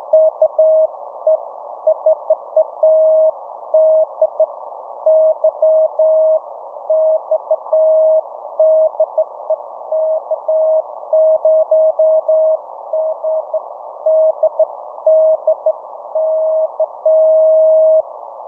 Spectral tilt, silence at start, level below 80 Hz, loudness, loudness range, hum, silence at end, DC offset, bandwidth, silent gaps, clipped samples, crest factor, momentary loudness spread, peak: -7.5 dB/octave; 0 s; -72 dBFS; -12 LUFS; 2 LU; none; 0 s; under 0.1%; 1.4 kHz; none; under 0.1%; 12 dB; 10 LU; 0 dBFS